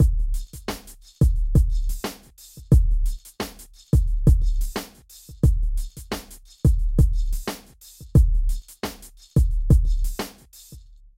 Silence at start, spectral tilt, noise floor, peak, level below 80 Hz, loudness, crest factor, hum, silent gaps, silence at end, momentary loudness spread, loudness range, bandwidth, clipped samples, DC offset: 0 s; -7 dB/octave; -45 dBFS; -6 dBFS; -22 dBFS; -24 LUFS; 16 dB; none; none; 0.4 s; 19 LU; 2 LU; 16 kHz; under 0.1%; under 0.1%